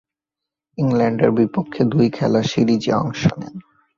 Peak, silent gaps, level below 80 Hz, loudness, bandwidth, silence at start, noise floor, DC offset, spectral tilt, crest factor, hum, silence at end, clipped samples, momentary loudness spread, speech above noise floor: -2 dBFS; none; -52 dBFS; -18 LUFS; 7.2 kHz; 0.8 s; -85 dBFS; under 0.1%; -7 dB/octave; 16 dB; none; 0.35 s; under 0.1%; 7 LU; 68 dB